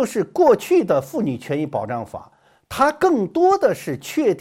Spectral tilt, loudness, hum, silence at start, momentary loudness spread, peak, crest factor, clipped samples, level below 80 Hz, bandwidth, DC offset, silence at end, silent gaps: -6 dB/octave; -19 LUFS; none; 0 s; 12 LU; -2 dBFS; 16 dB; under 0.1%; -56 dBFS; 16 kHz; under 0.1%; 0 s; none